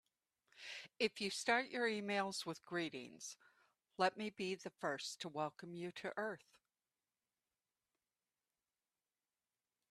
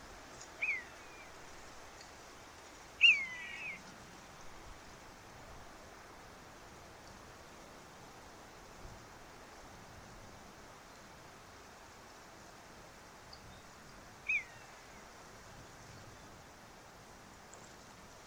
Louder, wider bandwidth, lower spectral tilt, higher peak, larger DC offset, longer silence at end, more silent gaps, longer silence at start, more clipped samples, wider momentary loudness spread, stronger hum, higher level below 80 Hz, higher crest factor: second, -42 LUFS vs -32 LUFS; second, 13.5 kHz vs over 20 kHz; first, -3.5 dB/octave vs -1.5 dB/octave; second, -20 dBFS vs -16 dBFS; neither; first, 3.55 s vs 0 s; neither; first, 0.55 s vs 0 s; neither; second, 14 LU vs 18 LU; neither; second, -88 dBFS vs -64 dBFS; about the same, 26 dB vs 28 dB